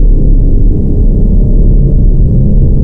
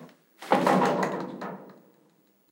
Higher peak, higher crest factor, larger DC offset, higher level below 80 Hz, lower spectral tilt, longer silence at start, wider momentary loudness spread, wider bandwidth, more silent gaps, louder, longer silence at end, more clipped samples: first, 0 dBFS vs -8 dBFS; second, 4 dB vs 22 dB; neither; first, -6 dBFS vs -78 dBFS; first, -13.5 dB/octave vs -6 dB/octave; about the same, 0 s vs 0 s; second, 2 LU vs 20 LU; second, 1 kHz vs 16.5 kHz; neither; first, -10 LUFS vs -26 LUFS; second, 0 s vs 0.8 s; neither